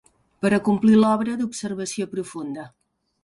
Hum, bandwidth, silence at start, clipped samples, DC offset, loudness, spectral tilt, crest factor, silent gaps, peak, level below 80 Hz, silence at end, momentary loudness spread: none; 11.5 kHz; 0.4 s; under 0.1%; under 0.1%; -22 LUFS; -6 dB/octave; 16 dB; none; -6 dBFS; -62 dBFS; 0.55 s; 16 LU